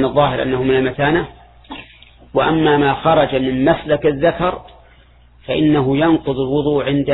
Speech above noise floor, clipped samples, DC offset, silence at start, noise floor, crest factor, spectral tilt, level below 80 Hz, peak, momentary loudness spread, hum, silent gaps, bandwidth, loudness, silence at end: 32 dB; under 0.1%; under 0.1%; 0 s; -47 dBFS; 16 dB; -10.5 dB/octave; -40 dBFS; 0 dBFS; 10 LU; none; none; 4.1 kHz; -16 LUFS; 0 s